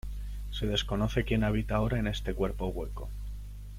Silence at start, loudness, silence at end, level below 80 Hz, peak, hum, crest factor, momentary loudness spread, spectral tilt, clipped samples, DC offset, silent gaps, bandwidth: 0.05 s; -32 LUFS; 0 s; -38 dBFS; -14 dBFS; 50 Hz at -35 dBFS; 16 dB; 13 LU; -6 dB/octave; under 0.1%; under 0.1%; none; 15.5 kHz